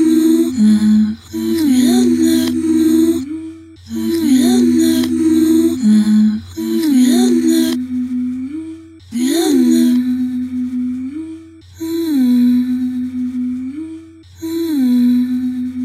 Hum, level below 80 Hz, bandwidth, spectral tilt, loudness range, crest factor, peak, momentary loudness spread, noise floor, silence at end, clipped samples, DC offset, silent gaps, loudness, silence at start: none; -52 dBFS; 15 kHz; -5.5 dB/octave; 5 LU; 12 dB; -2 dBFS; 14 LU; -35 dBFS; 0 s; under 0.1%; under 0.1%; none; -14 LUFS; 0 s